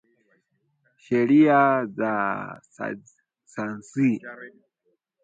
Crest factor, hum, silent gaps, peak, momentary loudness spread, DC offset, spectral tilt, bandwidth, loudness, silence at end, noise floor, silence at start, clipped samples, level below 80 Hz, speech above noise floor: 20 dB; none; none; -6 dBFS; 22 LU; under 0.1%; -7.5 dB/octave; 8 kHz; -23 LUFS; 0.75 s; -73 dBFS; 1.1 s; under 0.1%; -72 dBFS; 50 dB